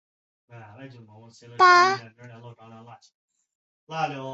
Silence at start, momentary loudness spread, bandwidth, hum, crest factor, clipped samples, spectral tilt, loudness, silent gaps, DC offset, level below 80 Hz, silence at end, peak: 0.8 s; 27 LU; 8 kHz; none; 20 dB; under 0.1%; -3.5 dB/octave; -20 LUFS; 3.14-3.28 s, 3.55-3.87 s; under 0.1%; -76 dBFS; 0 s; -6 dBFS